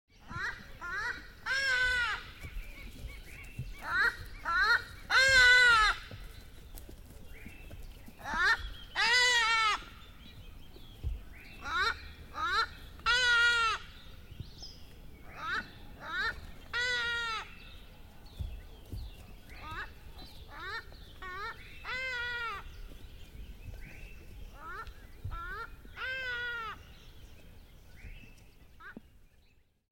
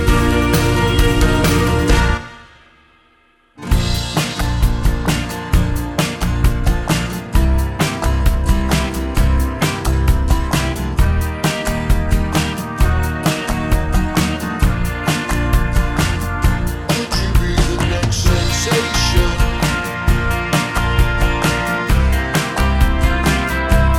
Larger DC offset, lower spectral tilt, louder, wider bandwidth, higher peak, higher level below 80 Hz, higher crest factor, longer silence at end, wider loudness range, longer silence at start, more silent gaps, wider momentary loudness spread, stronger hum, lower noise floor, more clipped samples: neither; second, -1.5 dB/octave vs -5 dB/octave; second, -29 LUFS vs -17 LUFS; about the same, 17 kHz vs 18.5 kHz; second, -12 dBFS vs -2 dBFS; second, -50 dBFS vs -18 dBFS; first, 22 dB vs 14 dB; first, 0.95 s vs 0 s; first, 18 LU vs 2 LU; first, 0.2 s vs 0 s; neither; first, 26 LU vs 5 LU; neither; first, -65 dBFS vs -54 dBFS; neither